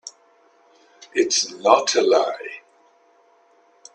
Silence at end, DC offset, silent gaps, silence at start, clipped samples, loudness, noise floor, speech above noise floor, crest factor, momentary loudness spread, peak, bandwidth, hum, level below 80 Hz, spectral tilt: 1.35 s; under 0.1%; none; 0.05 s; under 0.1%; -19 LUFS; -57 dBFS; 39 dB; 22 dB; 20 LU; 0 dBFS; 10 kHz; none; -74 dBFS; -1 dB/octave